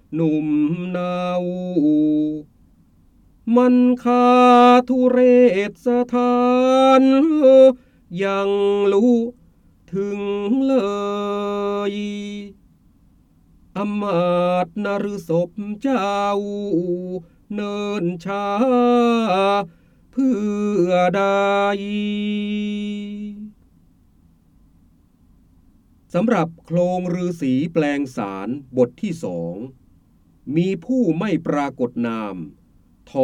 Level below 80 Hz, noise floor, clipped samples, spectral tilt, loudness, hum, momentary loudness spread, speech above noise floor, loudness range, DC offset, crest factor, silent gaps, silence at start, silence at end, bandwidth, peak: -56 dBFS; -54 dBFS; under 0.1%; -7 dB/octave; -19 LUFS; none; 15 LU; 36 dB; 10 LU; under 0.1%; 16 dB; none; 0.1 s; 0 s; 9.4 kHz; -2 dBFS